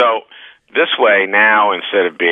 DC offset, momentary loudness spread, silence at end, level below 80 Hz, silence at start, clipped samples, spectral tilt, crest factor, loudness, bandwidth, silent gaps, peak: under 0.1%; 8 LU; 0 s; -78 dBFS; 0 s; under 0.1%; -6 dB/octave; 14 dB; -13 LUFS; 3.9 kHz; none; 0 dBFS